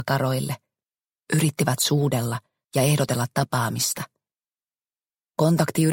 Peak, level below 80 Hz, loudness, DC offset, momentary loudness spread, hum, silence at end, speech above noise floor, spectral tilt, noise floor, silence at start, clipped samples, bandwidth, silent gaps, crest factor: -4 dBFS; -60 dBFS; -23 LUFS; under 0.1%; 11 LU; none; 0 s; over 68 dB; -5 dB/octave; under -90 dBFS; 0 s; under 0.1%; 17 kHz; none; 20 dB